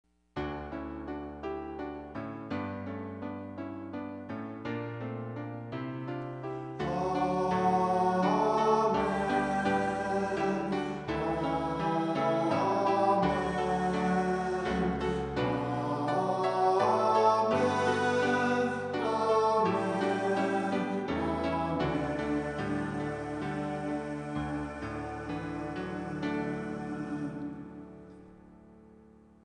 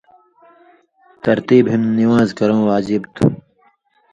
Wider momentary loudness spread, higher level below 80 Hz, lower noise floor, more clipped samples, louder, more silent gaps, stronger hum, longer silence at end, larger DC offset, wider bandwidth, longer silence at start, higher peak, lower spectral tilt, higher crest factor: first, 13 LU vs 7 LU; about the same, -54 dBFS vs -50 dBFS; about the same, -57 dBFS vs -57 dBFS; neither; second, -31 LUFS vs -16 LUFS; neither; neither; second, 0.6 s vs 0.75 s; neither; first, 10 kHz vs 8.2 kHz; second, 0.35 s vs 1.25 s; second, -14 dBFS vs 0 dBFS; second, -6.5 dB/octave vs -8 dB/octave; about the same, 18 dB vs 16 dB